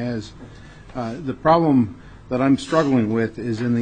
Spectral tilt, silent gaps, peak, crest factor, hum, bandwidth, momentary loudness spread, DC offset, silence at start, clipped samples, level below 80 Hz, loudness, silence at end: -7.5 dB/octave; none; -2 dBFS; 18 dB; none; 9.4 kHz; 14 LU; 0.1%; 0 s; under 0.1%; -48 dBFS; -20 LUFS; 0 s